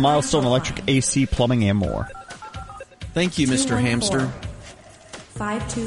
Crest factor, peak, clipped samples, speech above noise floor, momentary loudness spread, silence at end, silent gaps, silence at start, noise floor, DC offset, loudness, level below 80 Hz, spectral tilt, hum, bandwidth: 16 dB; -6 dBFS; under 0.1%; 23 dB; 19 LU; 0 s; none; 0 s; -44 dBFS; under 0.1%; -21 LUFS; -38 dBFS; -4.5 dB/octave; none; 11.5 kHz